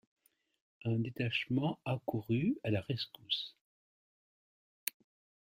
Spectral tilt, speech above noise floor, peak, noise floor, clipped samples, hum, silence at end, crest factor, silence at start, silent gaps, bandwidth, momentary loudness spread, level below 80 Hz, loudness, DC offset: -5.5 dB/octave; over 54 dB; -14 dBFS; under -90 dBFS; under 0.1%; none; 0.6 s; 24 dB; 0.85 s; 3.61-4.87 s; 15.5 kHz; 9 LU; -72 dBFS; -37 LUFS; under 0.1%